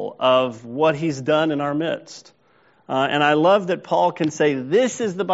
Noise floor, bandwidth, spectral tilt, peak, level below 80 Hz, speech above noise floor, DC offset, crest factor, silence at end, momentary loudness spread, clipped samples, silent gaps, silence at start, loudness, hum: -58 dBFS; 8 kHz; -3.5 dB/octave; -2 dBFS; -66 dBFS; 38 dB; under 0.1%; 18 dB; 0 s; 9 LU; under 0.1%; none; 0 s; -20 LUFS; none